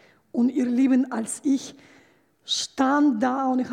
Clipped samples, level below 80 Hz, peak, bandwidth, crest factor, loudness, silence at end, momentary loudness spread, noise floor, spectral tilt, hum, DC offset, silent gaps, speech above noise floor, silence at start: under 0.1%; -72 dBFS; -8 dBFS; 12 kHz; 16 dB; -23 LUFS; 0 s; 7 LU; -59 dBFS; -3 dB/octave; none; under 0.1%; none; 36 dB; 0.35 s